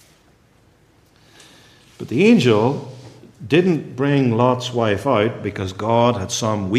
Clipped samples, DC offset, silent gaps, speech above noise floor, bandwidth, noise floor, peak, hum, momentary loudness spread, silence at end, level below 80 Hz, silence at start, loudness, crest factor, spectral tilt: under 0.1%; under 0.1%; none; 37 dB; 14 kHz; -55 dBFS; -2 dBFS; none; 12 LU; 0 s; -60 dBFS; 2 s; -18 LUFS; 18 dB; -6 dB/octave